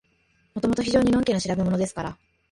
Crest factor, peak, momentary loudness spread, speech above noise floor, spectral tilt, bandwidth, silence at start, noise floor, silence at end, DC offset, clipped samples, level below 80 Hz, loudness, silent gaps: 16 dB; -8 dBFS; 14 LU; 43 dB; -6 dB/octave; 11.5 kHz; 0.55 s; -65 dBFS; 0.35 s; under 0.1%; under 0.1%; -46 dBFS; -24 LUFS; none